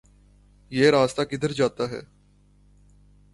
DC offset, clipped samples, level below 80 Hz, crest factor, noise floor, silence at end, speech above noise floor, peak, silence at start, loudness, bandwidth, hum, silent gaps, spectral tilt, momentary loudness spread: under 0.1%; under 0.1%; -56 dBFS; 20 dB; -58 dBFS; 1.3 s; 35 dB; -6 dBFS; 0.7 s; -23 LUFS; 11.5 kHz; 50 Hz at -50 dBFS; none; -5.5 dB/octave; 13 LU